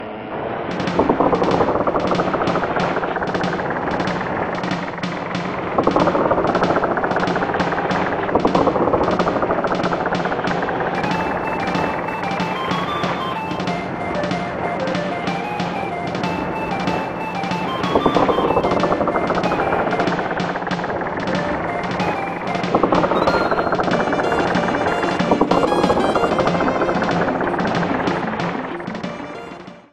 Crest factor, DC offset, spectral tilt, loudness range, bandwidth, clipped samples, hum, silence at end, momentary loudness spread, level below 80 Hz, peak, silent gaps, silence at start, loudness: 18 dB; under 0.1%; -6 dB/octave; 4 LU; 12 kHz; under 0.1%; none; 0.1 s; 7 LU; -44 dBFS; 0 dBFS; none; 0 s; -20 LUFS